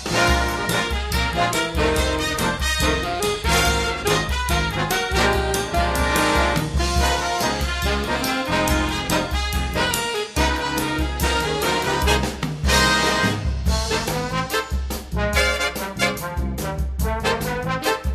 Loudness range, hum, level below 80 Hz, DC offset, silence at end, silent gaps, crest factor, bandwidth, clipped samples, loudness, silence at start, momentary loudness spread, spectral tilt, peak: 3 LU; none; -28 dBFS; under 0.1%; 0 s; none; 20 dB; 15.5 kHz; under 0.1%; -21 LUFS; 0 s; 6 LU; -4 dB/octave; -2 dBFS